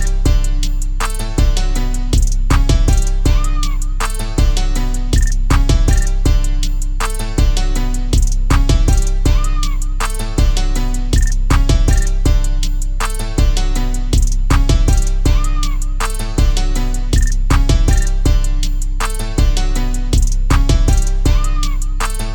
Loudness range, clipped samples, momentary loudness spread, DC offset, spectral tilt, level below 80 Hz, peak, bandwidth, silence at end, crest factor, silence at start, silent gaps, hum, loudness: 0 LU; under 0.1%; 6 LU; under 0.1%; -5 dB/octave; -12 dBFS; 0 dBFS; 17.5 kHz; 0 s; 12 dB; 0 s; none; none; -17 LUFS